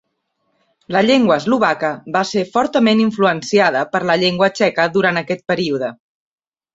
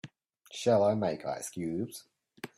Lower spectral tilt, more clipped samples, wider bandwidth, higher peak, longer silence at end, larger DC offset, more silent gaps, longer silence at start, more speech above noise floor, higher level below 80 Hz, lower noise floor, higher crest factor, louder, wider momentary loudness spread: about the same, -5 dB/octave vs -5.5 dB/octave; neither; second, 7.8 kHz vs 15 kHz; first, -2 dBFS vs -14 dBFS; first, 0.8 s vs 0.1 s; neither; neither; first, 0.9 s vs 0.05 s; first, 54 dB vs 23 dB; first, -58 dBFS vs -70 dBFS; first, -69 dBFS vs -53 dBFS; about the same, 16 dB vs 18 dB; first, -16 LUFS vs -31 LUFS; second, 7 LU vs 21 LU